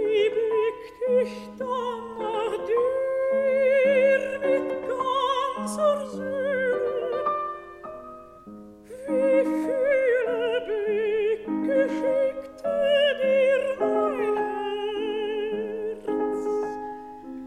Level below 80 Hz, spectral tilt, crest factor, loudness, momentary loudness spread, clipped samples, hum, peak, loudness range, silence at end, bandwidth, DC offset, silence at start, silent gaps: -62 dBFS; -4.5 dB/octave; 14 dB; -25 LUFS; 13 LU; under 0.1%; none; -10 dBFS; 4 LU; 0 s; 12 kHz; under 0.1%; 0 s; none